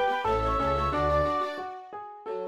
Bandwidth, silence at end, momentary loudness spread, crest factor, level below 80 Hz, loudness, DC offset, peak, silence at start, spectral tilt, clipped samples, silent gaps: 12.5 kHz; 0 s; 15 LU; 14 dB; -40 dBFS; -27 LUFS; under 0.1%; -14 dBFS; 0 s; -6.5 dB/octave; under 0.1%; none